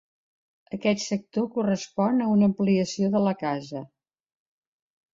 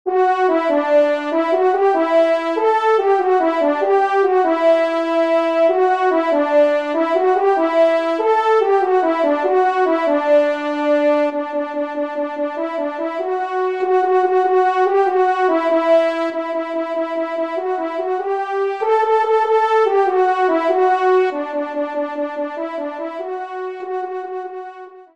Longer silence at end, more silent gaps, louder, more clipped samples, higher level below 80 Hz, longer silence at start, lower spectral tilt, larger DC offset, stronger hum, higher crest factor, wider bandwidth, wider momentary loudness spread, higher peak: first, 1.3 s vs 0.1 s; neither; second, -25 LUFS vs -17 LUFS; neither; about the same, -68 dBFS vs -70 dBFS; first, 0.7 s vs 0.05 s; first, -6 dB/octave vs -3.5 dB/octave; second, under 0.1% vs 0.2%; neither; about the same, 16 dB vs 12 dB; second, 7.6 kHz vs 8.4 kHz; about the same, 10 LU vs 9 LU; second, -10 dBFS vs -4 dBFS